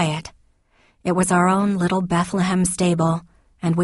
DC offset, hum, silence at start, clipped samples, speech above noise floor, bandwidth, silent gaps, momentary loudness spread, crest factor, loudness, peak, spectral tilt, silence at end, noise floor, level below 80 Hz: under 0.1%; none; 0 s; under 0.1%; 40 dB; 11.5 kHz; none; 11 LU; 16 dB; -20 LUFS; -6 dBFS; -5.5 dB/octave; 0 s; -59 dBFS; -48 dBFS